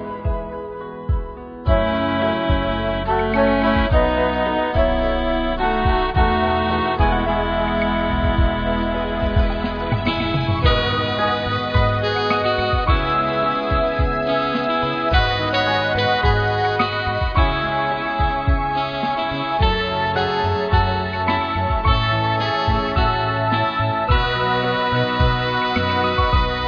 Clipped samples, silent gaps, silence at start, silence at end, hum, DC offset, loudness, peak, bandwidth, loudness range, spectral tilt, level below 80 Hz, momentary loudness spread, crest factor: under 0.1%; none; 0 s; 0 s; none; under 0.1%; -19 LUFS; -2 dBFS; 5.2 kHz; 1 LU; -7.5 dB/octave; -26 dBFS; 4 LU; 16 dB